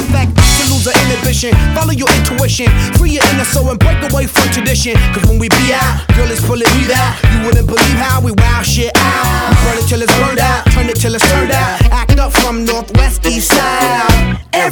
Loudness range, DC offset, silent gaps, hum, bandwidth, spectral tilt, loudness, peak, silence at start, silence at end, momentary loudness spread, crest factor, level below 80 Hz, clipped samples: 1 LU; under 0.1%; none; none; over 20 kHz; -4.5 dB/octave; -11 LUFS; 0 dBFS; 0 s; 0 s; 3 LU; 10 dB; -16 dBFS; under 0.1%